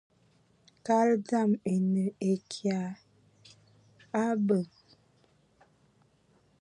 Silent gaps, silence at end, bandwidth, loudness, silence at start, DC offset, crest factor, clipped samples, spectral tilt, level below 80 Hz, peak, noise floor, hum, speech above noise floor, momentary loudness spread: none; 1.95 s; 10.5 kHz; -29 LUFS; 0.85 s; under 0.1%; 18 dB; under 0.1%; -7 dB/octave; -76 dBFS; -14 dBFS; -67 dBFS; none; 39 dB; 12 LU